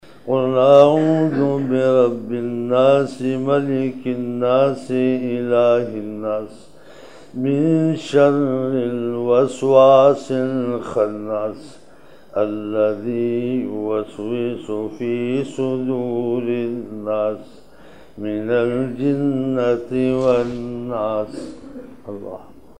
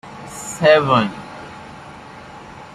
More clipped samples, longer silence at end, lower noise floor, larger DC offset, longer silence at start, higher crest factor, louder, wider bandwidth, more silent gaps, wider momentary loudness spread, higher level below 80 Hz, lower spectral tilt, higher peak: neither; first, 0.35 s vs 0.1 s; first, -47 dBFS vs -37 dBFS; first, 0.6% vs under 0.1%; first, 0.25 s vs 0.05 s; about the same, 18 dB vs 18 dB; second, -19 LUFS vs -16 LUFS; second, 10 kHz vs 14.5 kHz; neither; second, 12 LU vs 24 LU; about the same, -58 dBFS vs -54 dBFS; first, -7.5 dB/octave vs -4.5 dB/octave; about the same, 0 dBFS vs -2 dBFS